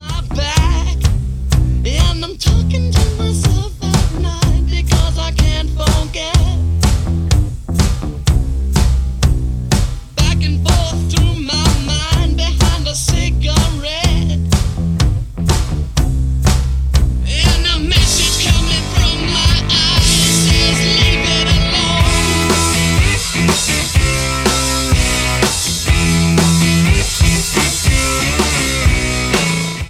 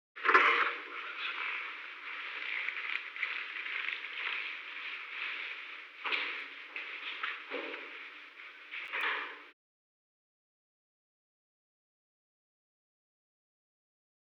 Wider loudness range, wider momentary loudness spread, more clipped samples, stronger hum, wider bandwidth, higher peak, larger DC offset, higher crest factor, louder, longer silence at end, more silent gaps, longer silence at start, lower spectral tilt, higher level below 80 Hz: second, 4 LU vs 7 LU; second, 5 LU vs 14 LU; neither; neither; about the same, 15.5 kHz vs 16 kHz; first, 0 dBFS vs -10 dBFS; neither; second, 14 dB vs 28 dB; first, -14 LUFS vs -35 LUFS; second, 0 s vs 4.8 s; neither; second, 0 s vs 0.15 s; first, -4 dB/octave vs 0 dB/octave; first, -18 dBFS vs under -90 dBFS